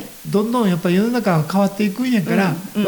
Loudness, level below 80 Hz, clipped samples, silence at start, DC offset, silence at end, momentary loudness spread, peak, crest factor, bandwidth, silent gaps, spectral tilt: -18 LUFS; -58 dBFS; under 0.1%; 0 s; under 0.1%; 0 s; 3 LU; -4 dBFS; 12 dB; over 20 kHz; none; -6.5 dB/octave